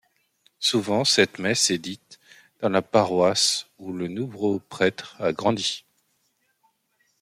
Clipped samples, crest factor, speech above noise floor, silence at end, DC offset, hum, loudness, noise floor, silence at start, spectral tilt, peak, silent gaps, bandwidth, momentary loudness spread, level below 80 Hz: under 0.1%; 22 dB; 47 dB; 1.4 s; under 0.1%; none; -23 LUFS; -70 dBFS; 0.6 s; -3 dB/octave; -4 dBFS; none; 16 kHz; 12 LU; -66 dBFS